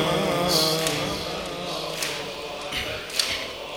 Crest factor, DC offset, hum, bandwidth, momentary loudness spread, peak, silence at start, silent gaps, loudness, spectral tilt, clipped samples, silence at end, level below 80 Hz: 22 dB; under 0.1%; none; over 20 kHz; 10 LU; -4 dBFS; 0 s; none; -25 LUFS; -3 dB/octave; under 0.1%; 0 s; -50 dBFS